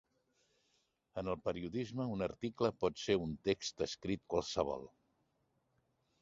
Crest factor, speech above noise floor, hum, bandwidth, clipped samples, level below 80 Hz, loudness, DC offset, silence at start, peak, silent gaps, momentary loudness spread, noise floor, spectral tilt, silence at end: 22 dB; 42 dB; none; 7.6 kHz; under 0.1%; -62 dBFS; -39 LUFS; under 0.1%; 1.15 s; -18 dBFS; none; 6 LU; -80 dBFS; -5 dB/octave; 1.35 s